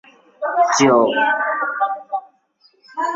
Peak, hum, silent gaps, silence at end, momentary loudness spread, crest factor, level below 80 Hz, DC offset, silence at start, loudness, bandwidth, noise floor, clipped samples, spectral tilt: -2 dBFS; none; none; 0 s; 15 LU; 18 dB; -66 dBFS; under 0.1%; 0.4 s; -18 LUFS; 7.8 kHz; -58 dBFS; under 0.1%; -3.5 dB/octave